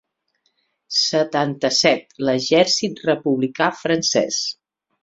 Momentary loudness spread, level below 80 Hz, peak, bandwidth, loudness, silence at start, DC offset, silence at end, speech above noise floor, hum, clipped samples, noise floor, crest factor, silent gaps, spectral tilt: 6 LU; -62 dBFS; -2 dBFS; 8 kHz; -19 LUFS; 0.9 s; under 0.1%; 0.5 s; 50 dB; none; under 0.1%; -69 dBFS; 18 dB; none; -3 dB/octave